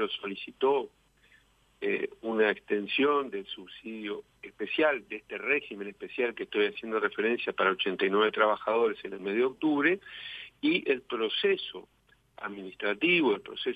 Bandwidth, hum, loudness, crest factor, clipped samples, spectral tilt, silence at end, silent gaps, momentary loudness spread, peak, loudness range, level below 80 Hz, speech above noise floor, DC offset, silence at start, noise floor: 5 kHz; none; -29 LUFS; 20 dB; under 0.1%; -6 dB/octave; 0 s; none; 14 LU; -10 dBFS; 3 LU; -72 dBFS; 34 dB; under 0.1%; 0 s; -64 dBFS